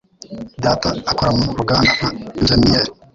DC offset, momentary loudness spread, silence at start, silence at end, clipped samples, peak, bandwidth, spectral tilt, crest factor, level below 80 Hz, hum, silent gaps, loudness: under 0.1%; 13 LU; 0.3 s; 0.2 s; under 0.1%; -2 dBFS; 7.8 kHz; -5 dB/octave; 16 dB; -34 dBFS; none; none; -16 LUFS